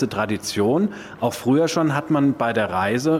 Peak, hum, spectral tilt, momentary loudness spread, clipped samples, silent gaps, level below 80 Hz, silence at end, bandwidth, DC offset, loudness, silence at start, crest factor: -6 dBFS; none; -5.5 dB/octave; 6 LU; under 0.1%; none; -58 dBFS; 0 s; 16.5 kHz; under 0.1%; -21 LUFS; 0 s; 14 dB